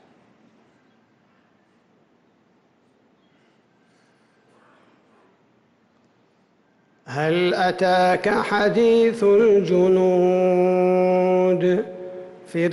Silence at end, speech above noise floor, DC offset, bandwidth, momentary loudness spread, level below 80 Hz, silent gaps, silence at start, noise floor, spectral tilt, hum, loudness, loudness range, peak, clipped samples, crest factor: 0 s; 44 dB; under 0.1%; 11.5 kHz; 11 LU; -62 dBFS; none; 7.1 s; -61 dBFS; -7 dB/octave; none; -19 LUFS; 10 LU; -10 dBFS; under 0.1%; 12 dB